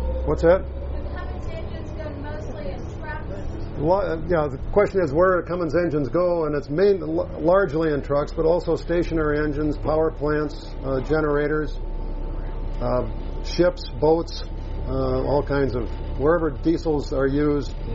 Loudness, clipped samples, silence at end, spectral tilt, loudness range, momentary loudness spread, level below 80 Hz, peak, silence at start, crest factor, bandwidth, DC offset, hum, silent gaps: -23 LUFS; under 0.1%; 0 s; -6.5 dB/octave; 5 LU; 13 LU; -30 dBFS; -6 dBFS; 0 s; 16 dB; 7.6 kHz; under 0.1%; none; none